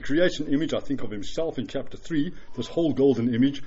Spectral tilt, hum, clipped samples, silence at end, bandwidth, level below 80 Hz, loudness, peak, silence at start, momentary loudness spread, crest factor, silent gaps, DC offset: -5.5 dB/octave; none; under 0.1%; 0 s; 7.8 kHz; -48 dBFS; -26 LUFS; -8 dBFS; 0 s; 11 LU; 16 dB; none; under 0.1%